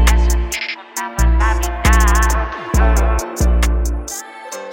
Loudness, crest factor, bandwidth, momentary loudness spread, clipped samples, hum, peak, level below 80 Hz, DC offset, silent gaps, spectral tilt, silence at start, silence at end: -17 LUFS; 14 dB; 17 kHz; 11 LU; under 0.1%; none; 0 dBFS; -16 dBFS; under 0.1%; none; -4.5 dB/octave; 0 s; 0 s